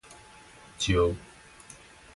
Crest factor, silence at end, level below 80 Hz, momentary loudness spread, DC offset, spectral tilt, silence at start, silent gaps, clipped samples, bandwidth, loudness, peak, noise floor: 20 dB; 0.95 s; -44 dBFS; 25 LU; under 0.1%; -4.5 dB/octave; 0.1 s; none; under 0.1%; 11.5 kHz; -28 LUFS; -12 dBFS; -52 dBFS